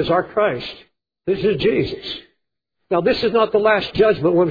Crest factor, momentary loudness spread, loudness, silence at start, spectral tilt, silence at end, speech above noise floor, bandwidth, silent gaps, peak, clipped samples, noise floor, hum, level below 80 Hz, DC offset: 16 dB; 14 LU; -18 LUFS; 0 s; -7.5 dB/octave; 0 s; 59 dB; 5 kHz; none; -2 dBFS; under 0.1%; -77 dBFS; none; -48 dBFS; under 0.1%